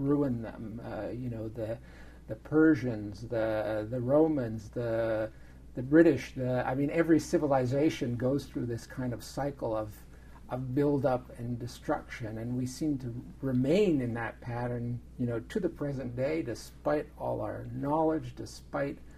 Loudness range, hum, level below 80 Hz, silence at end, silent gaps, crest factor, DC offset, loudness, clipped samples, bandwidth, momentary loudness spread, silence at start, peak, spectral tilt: 6 LU; none; -52 dBFS; 0 s; none; 22 dB; under 0.1%; -31 LUFS; under 0.1%; 14.5 kHz; 13 LU; 0 s; -8 dBFS; -7.5 dB/octave